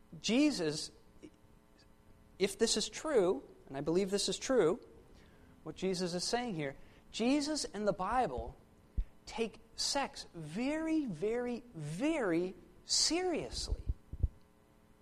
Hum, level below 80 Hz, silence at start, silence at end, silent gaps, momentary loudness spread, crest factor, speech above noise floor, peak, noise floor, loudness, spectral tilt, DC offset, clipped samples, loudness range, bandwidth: none; -50 dBFS; 0.1 s; 0.65 s; none; 14 LU; 18 dB; 30 dB; -18 dBFS; -64 dBFS; -35 LUFS; -3.5 dB/octave; under 0.1%; under 0.1%; 4 LU; 14.5 kHz